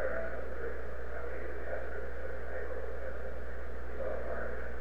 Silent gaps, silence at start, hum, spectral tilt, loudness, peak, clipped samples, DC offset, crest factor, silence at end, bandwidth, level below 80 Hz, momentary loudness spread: none; 0 s; none; -7.5 dB/octave; -41 LUFS; -22 dBFS; under 0.1%; 3%; 16 dB; 0 s; 10 kHz; -44 dBFS; 5 LU